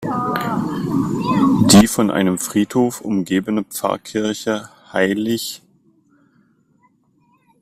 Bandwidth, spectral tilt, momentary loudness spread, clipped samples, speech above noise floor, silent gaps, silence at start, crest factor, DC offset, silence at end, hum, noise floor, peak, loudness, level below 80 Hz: 16 kHz; -4.5 dB/octave; 13 LU; under 0.1%; 40 dB; none; 0 s; 18 dB; under 0.1%; 2.05 s; none; -59 dBFS; 0 dBFS; -18 LUFS; -50 dBFS